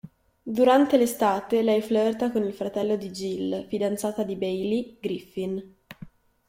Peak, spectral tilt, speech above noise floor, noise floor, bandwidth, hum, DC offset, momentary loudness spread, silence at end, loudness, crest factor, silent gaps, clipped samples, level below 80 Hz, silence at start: -6 dBFS; -5.5 dB/octave; 23 dB; -47 dBFS; 16.5 kHz; none; under 0.1%; 13 LU; 0.4 s; -25 LUFS; 18 dB; none; under 0.1%; -62 dBFS; 0.05 s